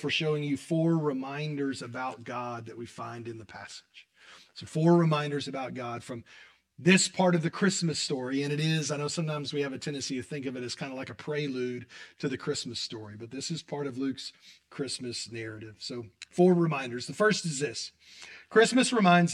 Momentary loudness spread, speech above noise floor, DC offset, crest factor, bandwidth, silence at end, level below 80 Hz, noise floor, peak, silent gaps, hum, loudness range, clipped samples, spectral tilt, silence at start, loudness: 18 LU; 26 dB; under 0.1%; 22 dB; 11.5 kHz; 0 s; -74 dBFS; -56 dBFS; -8 dBFS; none; none; 9 LU; under 0.1%; -5 dB/octave; 0 s; -29 LUFS